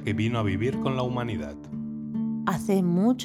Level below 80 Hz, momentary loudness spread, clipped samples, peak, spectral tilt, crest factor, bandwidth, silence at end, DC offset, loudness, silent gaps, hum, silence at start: -54 dBFS; 11 LU; under 0.1%; -10 dBFS; -7 dB/octave; 16 dB; 15.5 kHz; 0 s; under 0.1%; -27 LUFS; none; none; 0 s